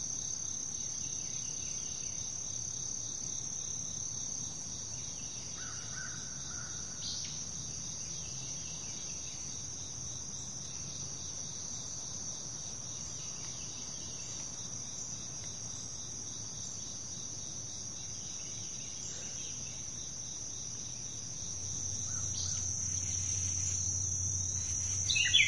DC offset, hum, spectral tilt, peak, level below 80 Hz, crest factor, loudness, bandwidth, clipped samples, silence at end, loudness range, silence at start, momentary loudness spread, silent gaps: 0.3%; none; -0.5 dB/octave; -12 dBFS; -60 dBFS; 26 dB; -37 LUFS; 11.5 kHz; under 0.1%; 0 s; 6 LU; 0 s; 8 LU; none